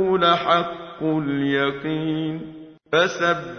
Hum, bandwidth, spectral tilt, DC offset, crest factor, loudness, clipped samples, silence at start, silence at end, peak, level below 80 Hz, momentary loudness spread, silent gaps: none; 6.6 kHz; -5.5 dB/octave; under 0.1%; 18 dB; -21 LUFS; under 0.1%; 0 s; 0 s; -4 dBFS; -58 dBFS; 11 LU; none